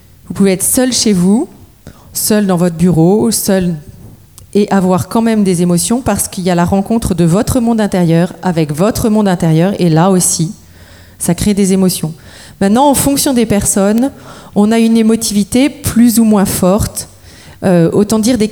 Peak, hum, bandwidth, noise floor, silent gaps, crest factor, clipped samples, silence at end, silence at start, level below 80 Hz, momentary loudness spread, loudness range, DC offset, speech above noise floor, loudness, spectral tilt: 0 dBFS; none; over 20 kHz; -37 dBFS; none; 12 dB; under 0.1%; 0 s; 0.3 s; -34 dBFS; 7 LU; 2 LU; 0.2%; 27 dB; -11 LUFS; -5.5 dB/octave